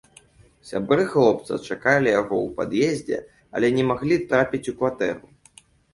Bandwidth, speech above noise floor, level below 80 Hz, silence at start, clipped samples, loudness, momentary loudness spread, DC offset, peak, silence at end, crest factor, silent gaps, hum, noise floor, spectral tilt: 11.5 kHz; 32 dB; -56 dBFS; 0.65 s; under 0.1%; -22 LUFS; 11 LU; under 0.1%; -4 dBFS; 0.75 s; 20 dB; none; none; -54 dBFS; -6 dB/octave